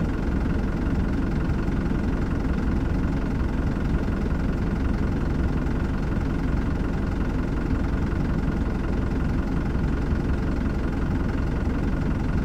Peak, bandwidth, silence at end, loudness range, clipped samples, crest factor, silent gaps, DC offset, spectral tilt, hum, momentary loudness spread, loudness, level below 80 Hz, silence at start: -12 dBFS; 9 kHz; 0 s; 0 LU; under 0.1%; 12 dB; none; under 0.1%; -8.5 dB/octave; none; 1 LU; -26 LUFS; -28 dBFS; 0 s